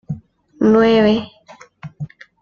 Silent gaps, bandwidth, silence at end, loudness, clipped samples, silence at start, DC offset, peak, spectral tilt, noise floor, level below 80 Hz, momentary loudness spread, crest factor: none; 7 kHz; 0.35 s; -14 LUFS; under 0.1%; 0.1 s; under 0.1%; -2 dBFS; -7.5 dB/octave; -45 dBFS; -50 dBFS; 25 LU; 16 dB